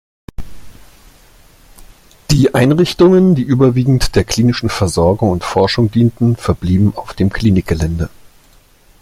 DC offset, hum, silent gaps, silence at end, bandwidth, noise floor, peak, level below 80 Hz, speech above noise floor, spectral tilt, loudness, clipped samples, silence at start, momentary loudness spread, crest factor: under 0.1%; none; none; 0.95 s; 15 kHz; -47 dBFS; 0 dBFS; -32 dBFS; 35 dB; -6.5 dB/octave; -13 LUFS; under 0.1%; 0.4 s; 7 LU; 14 dB